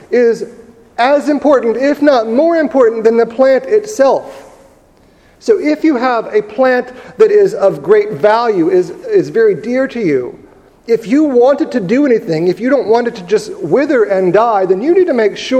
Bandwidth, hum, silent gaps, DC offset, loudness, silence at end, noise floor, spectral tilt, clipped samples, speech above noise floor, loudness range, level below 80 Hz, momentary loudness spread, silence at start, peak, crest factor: 9.8 kHz; none; none; under 0.1%; -12 LUFS; 0 s; -46 dBFS; -6 dB/octave; under 0.1%; 35 dB; 3 LU; -54 dBFS; 6 LU; 0.1 s; 0 dBFS; 12 dB